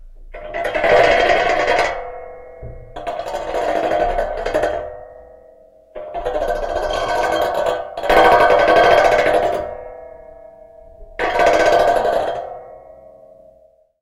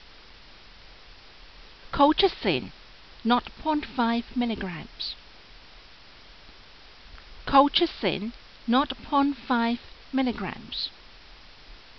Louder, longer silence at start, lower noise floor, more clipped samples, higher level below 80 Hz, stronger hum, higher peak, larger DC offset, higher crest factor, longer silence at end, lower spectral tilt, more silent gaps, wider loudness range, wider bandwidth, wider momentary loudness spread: first, -16 LUFS vs -26 LUFS; second, 0 s vs 0.9 s; about the same, -52 dBFS vs -51 dBFS; neither; first, -38 dBFS vs -50 dBFS; neither; first, 0 dBFS vs -6 dBFS; second, under 0.1% vs 0.2%; about the same, 18 dB vs 22 dB; first, 1.1 s vs 0.2 s; first, -4 dB/octave vs -2.5 dB/octave; neither; about the same, 8 LU vs 6 LU; first, 15.5 kHz vs 6.2 kHz; first, 23 LU vs 16 LU